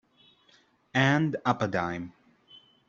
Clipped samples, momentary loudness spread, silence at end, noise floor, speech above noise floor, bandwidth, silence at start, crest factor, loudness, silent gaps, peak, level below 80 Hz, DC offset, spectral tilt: under 0.1%; 13 LU; 0.3 s; -64 dBFS; 37 dB; 7.6 kHz; 0.95 s; 22 dB; -27 LUFS; none; -8 dBFS; -64 dBFS; under 0.1%; -6 dB/octave